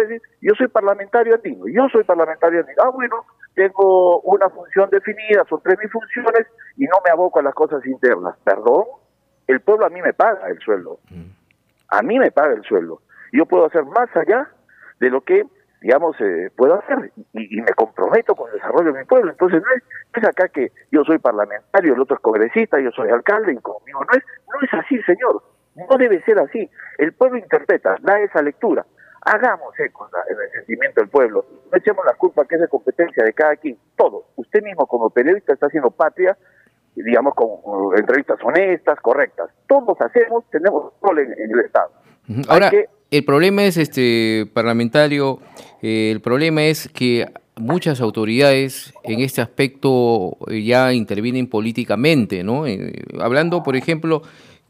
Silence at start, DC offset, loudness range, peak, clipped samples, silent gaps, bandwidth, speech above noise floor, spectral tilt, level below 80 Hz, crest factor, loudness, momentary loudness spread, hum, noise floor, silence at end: 0 s; under 0.1%; 3 LU; 0 dBFS; under 0.1%; none; 15.5 kHz; 45 dB; -6 dB/octave; -68 dBFS; 16 dB; -17 LUFS; 10 LU; none; -61 dBFS; 0.45 s